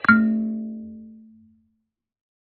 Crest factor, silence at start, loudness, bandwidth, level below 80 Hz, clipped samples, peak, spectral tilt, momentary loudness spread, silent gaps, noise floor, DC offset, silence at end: 22 dB; 0.05 s; -22 LUFS; 4.3 kHz; -60 dBFS; under 0.1%; -2 dBFS; -5 dB/octave; 23 LU; none; -76 dBFS; under 0.1%; 1.4 s